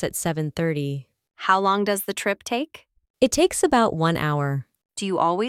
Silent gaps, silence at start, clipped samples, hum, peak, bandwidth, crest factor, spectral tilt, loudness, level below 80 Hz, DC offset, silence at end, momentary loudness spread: 3.10-3.14 s; 0 s; under 0.1%; none; -4 dBFS; 19 kHz; 18 dB; -4.5 dB/octave; -23 LUFS; -52 dBFS; under 0.1%; 0 s; 11 LU